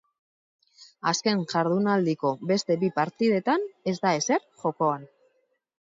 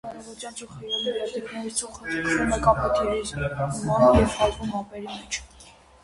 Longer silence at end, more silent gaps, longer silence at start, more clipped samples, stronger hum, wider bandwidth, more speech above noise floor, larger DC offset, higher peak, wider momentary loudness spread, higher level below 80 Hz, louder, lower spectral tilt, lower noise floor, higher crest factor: first, 0.9 s vs 0.35 s; neither; first, 0.8 s vs 0.05 s; neither; neither; second, 7.8 kHz vs 11.5 kHz; first, 46 dB vs 26 dB; neither; second, -8 dBFS vs -4 dBFS; second, 4 LU vs 17 LU; second, -74 dBFS vs -40 dBFS; about the same, -26 LUFS vs -24 LUFS; about the same, -5 dB/octave vs -4.5 dB/octave; first, -71 dBFS vs -50 dBFS; about the same, 18 dB vs 22 dB